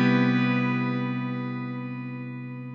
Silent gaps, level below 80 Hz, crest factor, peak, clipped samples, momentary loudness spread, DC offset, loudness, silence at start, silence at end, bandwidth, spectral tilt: none; -84 dBFS; 16 dB; -10 dBFS; under 0.1%; 14 LU; under 0.1%; -27 LUFS; 0 s; 0 s; 6.2 kHz; -8.5 dB/octave